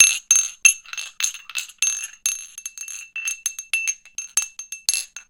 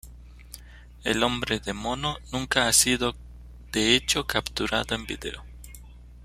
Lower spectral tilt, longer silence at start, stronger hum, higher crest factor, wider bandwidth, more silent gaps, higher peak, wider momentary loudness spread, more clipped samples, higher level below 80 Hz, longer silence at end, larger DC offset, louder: second, 6 dB/octave vs -2 dB/octave; about the same, 0 s vs 0.05 s; second, none vs 60 Hz at -45 dBFS; about the same, 24 dB vs 24 dB; about the same, 17 kHz vs 16 kHz; neither; first, 0 dBFS vs -4 dBFS; second, 15 LU vs 25 LU; neither; second, -68 dBFS vs -44 dBFS; about the same, 0.1 s vs 0 s; neither; first, -21 LUFS vs -25 LUFS